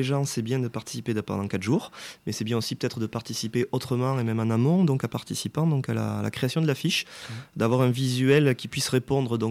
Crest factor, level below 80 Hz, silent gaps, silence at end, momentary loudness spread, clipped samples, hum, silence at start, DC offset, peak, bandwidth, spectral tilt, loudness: 16 dB; -62 dBFS; none; 0 s; 10 LU; under 0.1%; none; 0 s; under 0.1%; -10 dBFS; 15.5 kHz; -5.5 dB/octave; -26 LUFS